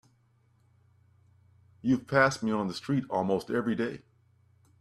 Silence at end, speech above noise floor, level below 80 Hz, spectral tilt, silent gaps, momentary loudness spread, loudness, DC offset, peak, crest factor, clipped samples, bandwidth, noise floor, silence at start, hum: 0.85 s; 39 dB; -66 dBFS; -6 dB/octave; none; 10 LU; -29 LUFS; under 0.1%; -8 dBFS; 24 dB; under 0.1%; 13 kHz; -67 dBFS; 1.85 s; none